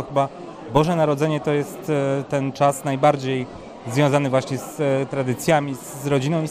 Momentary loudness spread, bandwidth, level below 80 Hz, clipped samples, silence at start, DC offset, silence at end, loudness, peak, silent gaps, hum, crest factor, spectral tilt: 8 LU; 15.5 kHz; -52 dBFS; under 0.1%; 0 s; under 0.1%; 0 s; -21 LUFS; -2 dBFS; none; none; 20 dB; -6 dB/octave